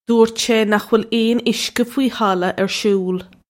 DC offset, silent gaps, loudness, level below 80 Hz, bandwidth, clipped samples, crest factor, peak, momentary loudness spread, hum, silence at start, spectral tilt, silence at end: under 0.1%; none; -17 LUFS; -58 dBFS; 16.5 kHz; under 0.1%; 16 dB; -2 dBFS; 4 LU; none; 0.1 s; -4.5 dB/octave; 0.25 s